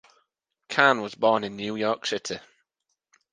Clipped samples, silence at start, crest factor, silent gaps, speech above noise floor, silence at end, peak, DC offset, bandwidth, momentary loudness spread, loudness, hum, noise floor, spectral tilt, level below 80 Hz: under 0.1%; 0.7 s; 26 dB; none; 55 dB; 0.95 s; -2 dBFS; under 0.1%; 9.8 kHz; 12 LU; -25 LUFS; none; -80 dBFS; -3.5 dB/octave; -72 dBFS